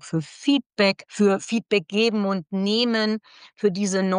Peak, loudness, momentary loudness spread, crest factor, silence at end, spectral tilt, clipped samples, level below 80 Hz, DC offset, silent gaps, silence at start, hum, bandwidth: -8 dBFS; -23 LUFS; 5 LU; 16 dB; 0 s; -5 dB/octave; under 0.1%; -74 dBFS; under 0.1%; 0.66-0.70 s; 0.05 s; none; 10 kHz